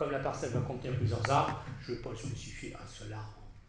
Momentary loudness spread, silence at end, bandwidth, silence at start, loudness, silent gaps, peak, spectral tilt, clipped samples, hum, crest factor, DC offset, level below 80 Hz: 15 LU; 0 s; 10 kHz; 0 s; -36 LUFS; none; -14 dBFS; -6 dB/octave; under 0.1%; none; 22 dB; under 0.1%; -52 dBFS